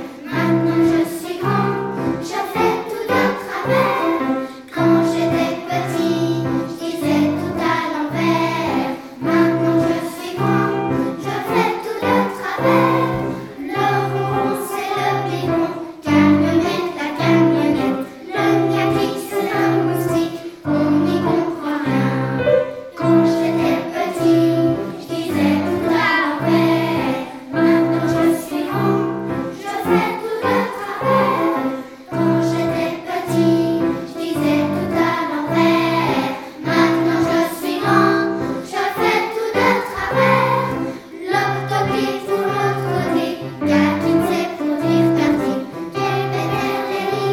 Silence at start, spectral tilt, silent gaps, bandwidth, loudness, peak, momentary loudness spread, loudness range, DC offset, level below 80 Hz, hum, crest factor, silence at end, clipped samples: 0 s; -6.5 dB/octave; none; 16.5 kHz; -18 LUFS; 0 dBFS; 8 LU; 2 LU; under 0.1%; -52 dBFS; none; 18 dB; 0 s; under 0.1%